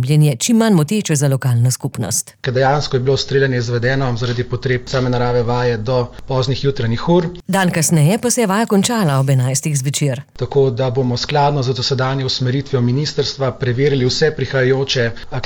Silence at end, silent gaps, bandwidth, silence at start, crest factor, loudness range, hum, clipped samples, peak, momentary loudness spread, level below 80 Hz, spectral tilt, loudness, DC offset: 0 s; none; 18.5 kHz; 0 s; 12 dB; 2 LU; none; under 0.1%; -4 dBFS; 6 LU; -40 dBFS; -5 dB/octave; -16 LUFS; under 0.1%